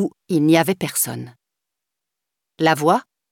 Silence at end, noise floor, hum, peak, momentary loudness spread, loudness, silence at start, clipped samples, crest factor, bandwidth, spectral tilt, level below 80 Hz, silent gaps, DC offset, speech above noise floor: 0.3 s; -83 dBFS; none; -2 dBFS; 9 LU; -19 LUFS; 0 s; under 0.1%; 20 dB; 18 kHz; -4.5 dB/octave; -66 dBFS; none; under 0.1%; 65 dB